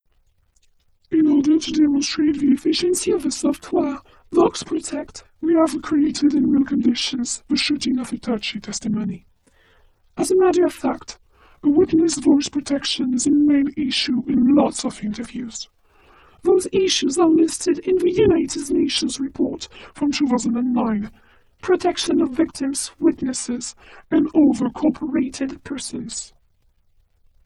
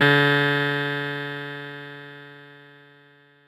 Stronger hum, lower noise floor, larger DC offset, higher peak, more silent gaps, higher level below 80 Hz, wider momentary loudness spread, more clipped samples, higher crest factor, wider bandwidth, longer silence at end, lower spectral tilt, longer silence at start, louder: neither; first, -61 dBFS vs -55 dBFS; neither; about the same, -4 dBFS vs -6 dBFS; neither; first, -52 dBFS vs -74 dBFS; second, 12 LU vs 23 LU; neither; about the same, 18 dB vs 18 dB; second, 12.5 kHz vs 15.5 kHz; first, 1.2 s vs 0.9 s; second, -4 dB/octave vs -6 dB/octave; first, 1.1 s vs 0 s; about the same, -20 LUFS vs -22 LUFS